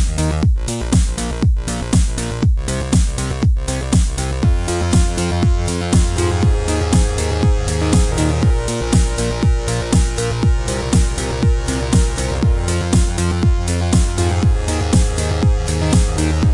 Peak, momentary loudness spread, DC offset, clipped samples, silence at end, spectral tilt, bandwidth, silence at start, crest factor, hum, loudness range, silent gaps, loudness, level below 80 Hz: -2 dBFS; 3 LU; under 0.1%; under 0.1%; 0 s; -5.5 dB/octave; 11.5 kHz; 0 s; 14 dB; none; 1 LU; none; -17 LUFS; -20 dBFS